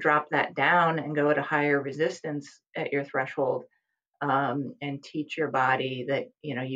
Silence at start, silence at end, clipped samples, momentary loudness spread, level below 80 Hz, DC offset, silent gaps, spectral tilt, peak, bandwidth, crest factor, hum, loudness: 0 s; 0 s; under 0.1%; 12 LU; -82 dBFS; under 0.1%; none; -6 dB/octave; -8 dBFS; 8.8 kHz; 20 dB; none; -27 LUFS